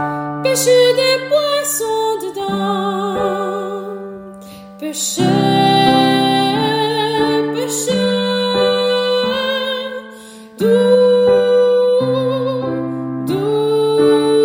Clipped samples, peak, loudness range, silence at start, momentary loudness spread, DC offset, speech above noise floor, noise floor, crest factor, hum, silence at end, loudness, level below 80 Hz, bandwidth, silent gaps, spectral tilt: under 0.1%; 0 dBFS; 5 LU; 0 s; 12 LU; under 0.1%; 21 dB; -36 dBFS; 14 dB; none; 0 s; -15 LUFS; -54 dBFS; 16.5 kHz; none; -4 dB/octave